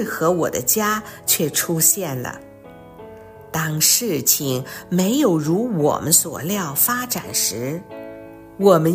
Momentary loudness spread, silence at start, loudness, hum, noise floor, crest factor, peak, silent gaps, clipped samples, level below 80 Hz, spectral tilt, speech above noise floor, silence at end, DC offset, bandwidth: 13 LU; 0 s; -18 LUFS; none; -41 dBFS; 20 dB; 0 dBFS; none; under 0.1%; -56 dBFS; -3.5 dB/octave; 22 dB; 0 s; under 0.1%; 16 kHz